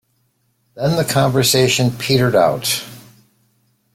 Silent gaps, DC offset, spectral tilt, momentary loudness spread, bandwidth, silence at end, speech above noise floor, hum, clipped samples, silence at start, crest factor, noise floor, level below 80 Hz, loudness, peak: none; under 0.1%; -4.5 dB/octave; 8 LU; 16.5 kHz; 0.95 s; 49 dB; none; under 0.1%; 0.75 s; 16 dB; -64 dBFS; -50 dBFS; -16 LUFS; -2 dBFS